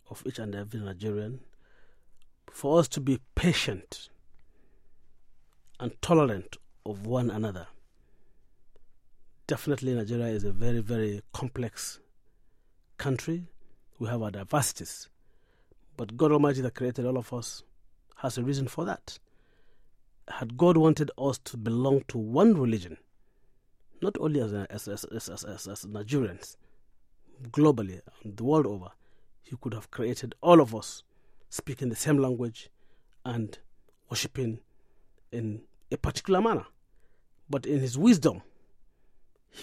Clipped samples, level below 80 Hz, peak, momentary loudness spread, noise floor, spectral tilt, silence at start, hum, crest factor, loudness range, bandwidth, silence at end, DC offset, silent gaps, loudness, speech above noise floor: under 0.1%; -52 dBFS; -6 dBFS; 18 LU; -60 dBFS; -6 dB/octave; 0.1 s; none; 24 dB; 8 LU; 16 kHz; 0 s; under 0.1%; none; -29 LUFS; 33 dB